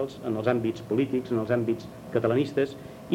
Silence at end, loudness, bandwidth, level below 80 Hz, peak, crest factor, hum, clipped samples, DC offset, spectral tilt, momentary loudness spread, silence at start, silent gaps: 0 s; -28 LUFS; 16.5 kHz; -60 dBFS; -8 dBFS; 18 dB; none; under 0.1%; under 0.1%; -7.5 dB/octave; 6 LU; 0 s; none